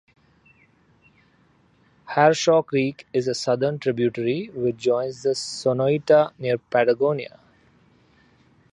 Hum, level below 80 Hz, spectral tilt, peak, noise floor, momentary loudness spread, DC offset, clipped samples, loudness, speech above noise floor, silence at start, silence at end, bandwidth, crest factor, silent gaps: none; -66 dBFS; -5.5 dB/octave; -2 dBFS; -60 dBFS; 8 LU; under 0.1%; under 0.1%; -22 LUFS; 38 dB; 2.05 s; 1.45 s; 10.5 kHz; 20 dB; none